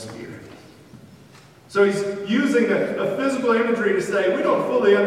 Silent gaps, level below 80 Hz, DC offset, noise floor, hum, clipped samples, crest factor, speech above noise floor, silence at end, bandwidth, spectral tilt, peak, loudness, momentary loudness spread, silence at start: none; -64 dBFS; under 0.1%; -48 dBFS; none; under 0.1%; 16 dB; 28 dB; 0 s; 13.5 kHz; -5.5 dB/octave; -6 dBFS; -20 LUFS; 11 LU; 0 s